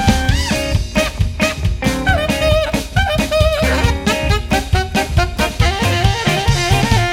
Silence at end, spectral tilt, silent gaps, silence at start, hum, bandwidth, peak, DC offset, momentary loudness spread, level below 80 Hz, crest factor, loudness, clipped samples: 0 s; -5 dB/octave; none; 0 s; none; 16.5 kHz; 0 dBFS; under 0.1%; 3 LU; -22 dBFS; 14 dB; -16 LUFS; under 0.1%